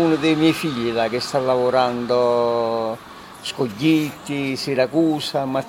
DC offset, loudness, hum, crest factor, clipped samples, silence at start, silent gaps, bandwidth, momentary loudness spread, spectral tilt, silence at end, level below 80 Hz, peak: under 0.1%; -20 LUFS; none; 16 dB; under 0.1%; 0 s; none; 16.5 kHz; 8 LU; -5.5 dB/octave; 0 s; -56 dBFS; -4 dBFS